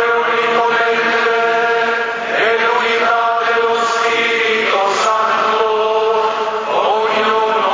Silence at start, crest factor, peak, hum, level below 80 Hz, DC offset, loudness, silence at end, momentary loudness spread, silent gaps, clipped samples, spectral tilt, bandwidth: 0 s; 14 dB; -2 dBFS; none; -60 dBFS; under 0.1%; -14 LUFS; 0 s; 2 LU; none; under 0.1%; -2 dB/octave; 7.6 kHz